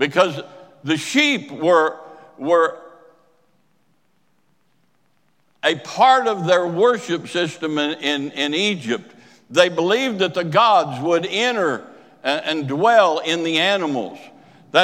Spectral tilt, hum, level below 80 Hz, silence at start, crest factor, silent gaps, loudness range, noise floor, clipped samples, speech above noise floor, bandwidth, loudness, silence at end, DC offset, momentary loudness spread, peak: -4 dB/octave; none; -76 dBFS; 0 s; 20 dB; none; 7 LU; -66 dBFS; under 0.1%; 47 dB; 15.5 kHz; -19 LUFS; 0 s; under 0.1%; 10 LU; 0 dBFS